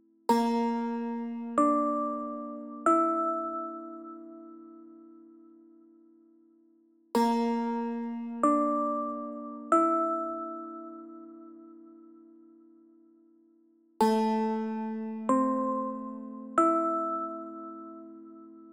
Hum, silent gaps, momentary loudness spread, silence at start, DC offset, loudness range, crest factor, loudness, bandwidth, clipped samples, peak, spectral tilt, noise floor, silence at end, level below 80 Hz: none; none; 22 LU; 0.3 s; under 0.1%; 12 LU; 20 dB; -29 LUFS; 15.5 kHz; under 0.1%; -12 dBFS; -6 dB/octave; -64 dBFS; 0 s; -76 dBFS